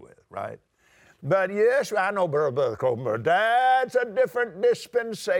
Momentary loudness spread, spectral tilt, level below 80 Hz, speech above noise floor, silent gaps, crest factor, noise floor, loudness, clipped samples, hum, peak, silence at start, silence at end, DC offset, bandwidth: 15 LU; -5 dB/octave; -70 dBFS; 35 dB; none; 14 dB; -59 dBFS; -23 LUFS; under 0.1%; none; -10 dBFS; 0 s; 0 s; under 0.1%; 17 kHz